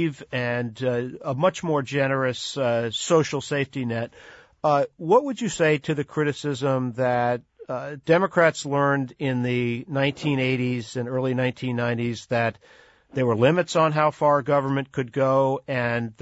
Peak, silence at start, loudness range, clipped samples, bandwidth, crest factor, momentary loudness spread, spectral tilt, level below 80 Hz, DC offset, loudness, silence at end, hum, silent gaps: -6 dBFS; 0 s; 3 LU; under 0.1%; 8 kHz; 18 dB; 8 LU; -6 dB/octave; -62 dBFS; under 0.1%; -24 LUFS; 0.1 s; none; none